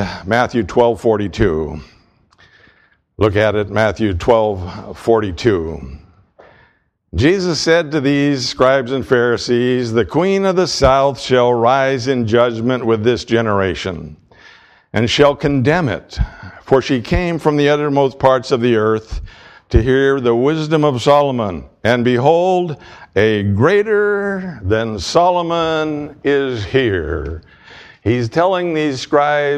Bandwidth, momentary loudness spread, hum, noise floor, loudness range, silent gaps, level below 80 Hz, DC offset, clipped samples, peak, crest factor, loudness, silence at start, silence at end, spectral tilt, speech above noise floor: 11.5 kHz; 10 LU; none; -56 dBFS; 4 LU; none; -34 dBFS; under 0.1%; under 0.1%; 0 dBFS; 16 dB; -15 LUFS; 0 s; 0 s; -6 dB/octave; 42 dB